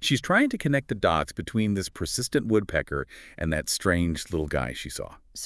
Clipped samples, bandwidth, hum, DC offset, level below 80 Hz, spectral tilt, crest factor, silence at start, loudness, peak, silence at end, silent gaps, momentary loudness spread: under 0.1%; 12 kHz; none; under 0.1%; -44 dBFS; -4.5 dB/octave; 20 dB; 0 s; -26 LUFS; -8 dBFS; 0 s; none; 11 LU